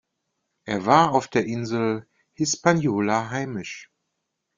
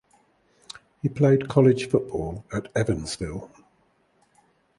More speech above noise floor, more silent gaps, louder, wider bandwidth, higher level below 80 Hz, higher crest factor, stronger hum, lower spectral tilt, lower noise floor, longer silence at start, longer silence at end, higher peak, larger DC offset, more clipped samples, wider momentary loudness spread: first, 57 dB vs 42 dB; neither; about the same, -23 LUFS vs -24 LUFS; second, 9.6 kHz vs 11.5 kHz; second, -62 dBFS vs -48 dBFS; about the same, 22 dB vs 22 dB; neither; second, -5 dB/octave vs -7 dB/octave; first, -79 dBFS vs -65 dBFS; second, 0.65 s vs 1.05 s; second, 0.75 s vs 1.3 s; about the same, -2 dBFS vs -4 dBFS; neither; neither; second, 15 LU vs 20 LU